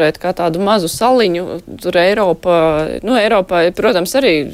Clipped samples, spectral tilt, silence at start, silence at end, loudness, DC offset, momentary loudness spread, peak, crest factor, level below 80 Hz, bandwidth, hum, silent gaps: under 0.1%; -4.5 dB/octave; 0 s; 0 s; -14 LUFS; under 0.1%; 5 LU; -2 dBFS; 12 dB; -42 dBFS; 16 kHz; none; none